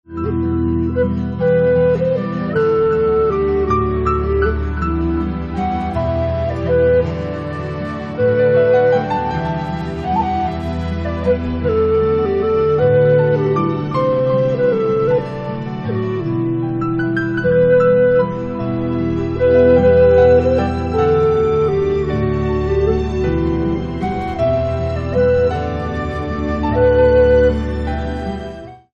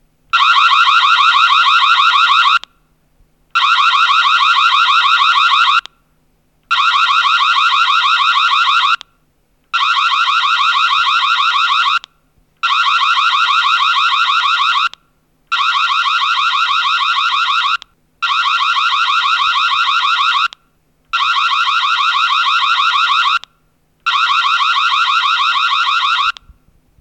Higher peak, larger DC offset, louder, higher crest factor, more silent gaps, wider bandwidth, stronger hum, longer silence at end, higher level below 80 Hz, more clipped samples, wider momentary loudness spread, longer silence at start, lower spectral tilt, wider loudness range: about the same, -2 dBFS vs 0 dBFS; neither; second, -16 LUFS vs -11 LUFS; about the same, 14 dB vs 14 dB; neither; second, 7 kHz vs 11.5 kHz; neither; second, 0.15 s vs 0.7 s; first, -32 dBFS vs -60 dBFS; neither; first, 10 LU vs 7 LU; second, 0.1 s vs 0.35 s; first, -9 dB/octave vs 3.5 dB/octave; about the same, 5 LU vs 3 LU